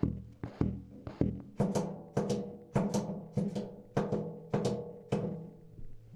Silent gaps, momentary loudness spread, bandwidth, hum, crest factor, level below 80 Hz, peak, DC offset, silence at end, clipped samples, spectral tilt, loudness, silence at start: none; 13 LU; 12.5 kHz; none; 22 dB; -52 dBFS; -14 dBFS; under 0.1%; 0 s; under 0.1%; -7.5 dB/octave; -36 LUFS; 0 s